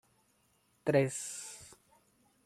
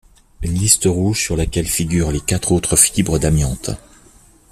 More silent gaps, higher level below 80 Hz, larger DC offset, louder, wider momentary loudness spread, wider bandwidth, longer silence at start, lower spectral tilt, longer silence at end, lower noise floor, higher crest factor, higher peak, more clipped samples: neither; second, -74 dBFS vs -30 dBFS; neither; second, -34 LUFS vs -16 LUFS; first, 20 LU vs 12 LU; second, 14.5 kHz vs 16 kHz; first, 0.85 s vs 0.4 s; about the same, -5 dB/octave vs -4 dB/octave; about the same, 0.7 s vs 0.75 s; first, -73 dBFS vs -48 dBFS; about the same, 22 dB vs 18 dB; second, -14 dBFS vs 0 dBFS; neither